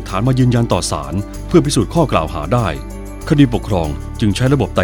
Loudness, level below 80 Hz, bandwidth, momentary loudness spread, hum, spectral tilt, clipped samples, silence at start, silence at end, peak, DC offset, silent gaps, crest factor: -16 LUFS; -28 dBFS; 18.5 kHz; 10 LU; none; -6 dB/octave; under 0.1%; 0 s; 0 s; 0 dBFS; under 0.1%; none; 16 dB